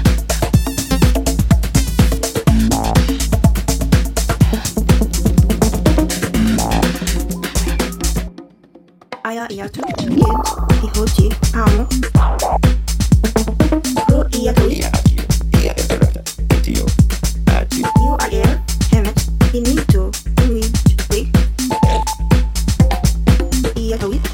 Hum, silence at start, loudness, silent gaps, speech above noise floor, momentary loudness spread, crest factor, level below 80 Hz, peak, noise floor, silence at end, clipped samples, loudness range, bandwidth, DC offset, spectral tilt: none; 0 s; -16 LUFS; none; 32 dB; 5 LU; 14 dB; -18 dBFS; 0 dBFS; -46 dBFS; 0 s; under 0.1%; 4 LU; 17 kHz; under 0.1%; -5.5 dB/octave